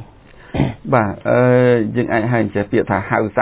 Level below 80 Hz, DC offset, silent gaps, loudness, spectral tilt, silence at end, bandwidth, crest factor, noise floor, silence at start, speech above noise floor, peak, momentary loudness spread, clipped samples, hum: -40 dBFS; under 0.1%; none; -16 LUFS; -11.5 dB/octave; 0 s; 4 kHz; 16 dB; -42 dBFS; 0 s; 27 dB; 0 dBFS; 8 LU; under 0.1%; none